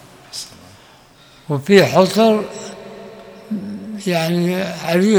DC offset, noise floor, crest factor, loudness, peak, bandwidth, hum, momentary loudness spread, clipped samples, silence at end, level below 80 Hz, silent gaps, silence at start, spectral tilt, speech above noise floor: under 0.1%; -47 dBFS; 18 dB; -16 LUFS; 0 dBFS; over 20 kHz; none; 23 LU; under 0.1%; 0 s; -58 dBFS; none; 0.35 s; -5.5 dB/octave; 32 dB